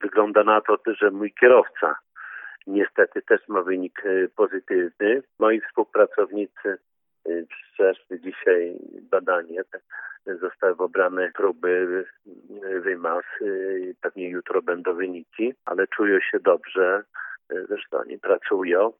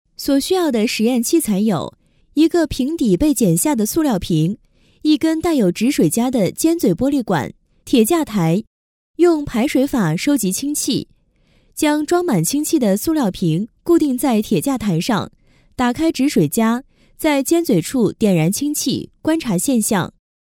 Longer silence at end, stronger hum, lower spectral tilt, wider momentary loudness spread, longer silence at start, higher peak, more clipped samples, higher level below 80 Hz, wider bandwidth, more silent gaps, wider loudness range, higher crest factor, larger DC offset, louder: second, 0.1 s vs 0.5 s; neither; first, -9 dB/octave vs -5 dB/octave; first, 14 LU vs 6 LU; second, 0 s vs 0.2 s; about the same, -2 dBFS vs -2 dBFS; neither; second, -80 dBFS vs -44 dBFS; second, 3.7 kHz vs 17.5 kHz; second, none vs 8.67-9.14 s; first, 6 LU vs 2 LU; first, 22 dB vs 16 dB; neither; second, -23 LUFS vs -17 LUFS